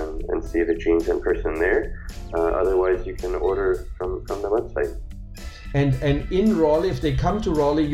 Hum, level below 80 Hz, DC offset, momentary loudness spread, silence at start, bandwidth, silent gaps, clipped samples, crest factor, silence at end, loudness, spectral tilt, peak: none; -32 dBFS; under 0.1%; 10 LU; 0 s; 14.5 kHz; none; under 0.1%; 16 dB; 0 s; -23 LUFS; -7.5 dB/octave; -6 dBFS